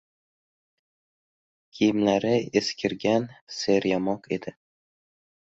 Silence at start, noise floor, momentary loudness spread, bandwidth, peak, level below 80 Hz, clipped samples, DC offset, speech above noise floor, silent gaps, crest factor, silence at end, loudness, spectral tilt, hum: 1.75 s; under -90 dBFS; 10 LU; 8 kHz; -8 dBFS; -64 dBFS; under 0.1%; under 0.1%; over 65 dB; 3.41-3.47 s; 20 dB; 1.1 s; -25 LUFS; -5 dB/octave; none